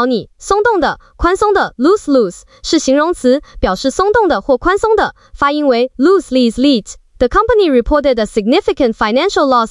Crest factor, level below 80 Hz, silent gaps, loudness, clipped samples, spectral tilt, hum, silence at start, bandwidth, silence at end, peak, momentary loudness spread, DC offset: 12 dB; -32 dBFS; none; -13 LUFS; under 0.1%; -4.5 dB/octave; none; 0 s; 12 kHz; 0 s; -2 dBFS; 6 LU; under 0.1%